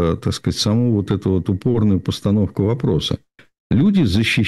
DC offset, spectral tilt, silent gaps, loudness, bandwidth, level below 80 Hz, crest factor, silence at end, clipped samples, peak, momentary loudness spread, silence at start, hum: under 0.1%; -6.5 dB/octave; 3.60-3.70 s; -18 LUFS; 12.5 kHz; -40 dBFS; 10 dB; 0 s; under 0.1%; -8 dBFS; 6 LU; 0 s; none